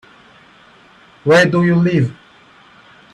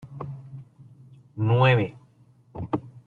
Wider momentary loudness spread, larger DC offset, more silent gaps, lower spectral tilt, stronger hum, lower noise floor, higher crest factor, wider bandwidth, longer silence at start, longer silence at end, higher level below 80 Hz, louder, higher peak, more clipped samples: second, 11 LU vs 25 LU; neither; neither; second, -6.5 dB/octave vs -8.5 dB/octave; neither; second, -46 dBFS vs -57 dBFS; about the same, 16 dB vs 20 dB; first, 10.5 kHz vs 4.4 kHz; first, 1.25 s vs 0.05 s; first, 1 s vs 0.05 s; first, -54 dBFS vs -60 dBFS; first, -14 LUFS vs -23 LUFS; first, -2 dBFS vs -8 dBFS; neither